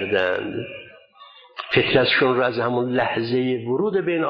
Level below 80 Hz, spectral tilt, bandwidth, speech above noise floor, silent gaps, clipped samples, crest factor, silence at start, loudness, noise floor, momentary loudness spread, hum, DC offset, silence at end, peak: -58 dBFS; -8 dB/octave; 5.4 kHz; 27 dB; none; under 0.1%; 16 dB; 0 s; -21 LUFS; -48 dBFS; 17 LU; none; under 0.1%; 0 s; -6 dBFS